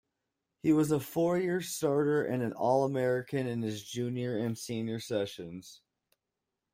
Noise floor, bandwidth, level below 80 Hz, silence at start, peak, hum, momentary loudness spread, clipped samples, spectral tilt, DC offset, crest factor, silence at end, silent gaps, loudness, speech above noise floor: -87 dBFS; 16 kHz; -70 dBFS; 0.65 s; -14 dBFS; none; 8 LU; under 0.1%; -6 dB/octave; under 0.1%; 18 dB; 0.95 s; none; -31 LUFS; 56 dB